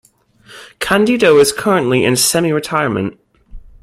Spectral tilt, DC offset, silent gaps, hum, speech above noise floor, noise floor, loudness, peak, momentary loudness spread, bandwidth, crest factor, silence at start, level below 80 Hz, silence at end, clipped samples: -4 dB/octave; under 0.1%; none; none; 33 dB; -46 dBFS; -13 LUFS; 0 dBFS; 10 LU; 16 kHz; 14 dB; 0.5 s; -44 dBFS; 0.15 s; under 0.1%